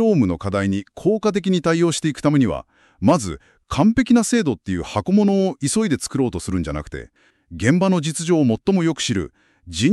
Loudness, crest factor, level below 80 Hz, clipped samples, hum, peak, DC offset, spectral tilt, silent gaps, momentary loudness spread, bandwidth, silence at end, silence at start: -19 LUFS; 16 dB; -44 dBFS; under 0.1%; none; -4 dBFS; under 0.1%; -5.5 dB/octave; none; 11 LU; 12.5 kHz; 0 s; 0 s